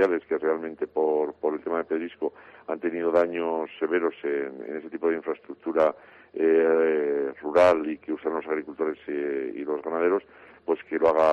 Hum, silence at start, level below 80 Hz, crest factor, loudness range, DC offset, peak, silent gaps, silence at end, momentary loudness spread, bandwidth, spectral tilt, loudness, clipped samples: none; 0 s; -66 dBFS; 16 dB; 4 LU; under 0.1%; -10 dBFS; none; 0 s; 13 LU; 8 kHz; -6.5 dB/octave; -26 LUFS; under 0.1%